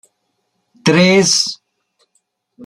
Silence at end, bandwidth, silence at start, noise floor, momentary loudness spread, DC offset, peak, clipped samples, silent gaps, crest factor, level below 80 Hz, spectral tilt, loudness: 0 s; 13 kHz; 0.85 s; -69 dBFS; 10 LU; under 0.1%; 0 dBFS; under 0.1%; none; 16 dB; -58 dBFS; -3.5 dB/octave; -12 LUFS